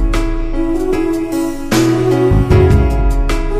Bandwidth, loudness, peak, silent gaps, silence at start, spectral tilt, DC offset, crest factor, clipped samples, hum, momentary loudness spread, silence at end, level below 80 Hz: 15.5 kHz; -14 LUFS; 0 dBFS; none; 0 s; -7 dB/octave; under 0.1%; 12 dB; under 0.1%; none; 8 LU; 0 s; -16 dBFS